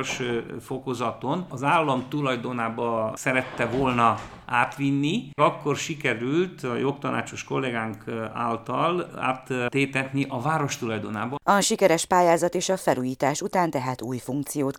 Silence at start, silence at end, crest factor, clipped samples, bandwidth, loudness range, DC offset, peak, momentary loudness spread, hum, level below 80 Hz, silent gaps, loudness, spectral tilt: 0 s; 0 s; 20 dB; under 0.1%; 18.5 kHz; 4 LU; under 0.1%; -6 dBFS; 9 LU; none; -58 dBFS; none; -25 LUFS; -4.5 dB/octave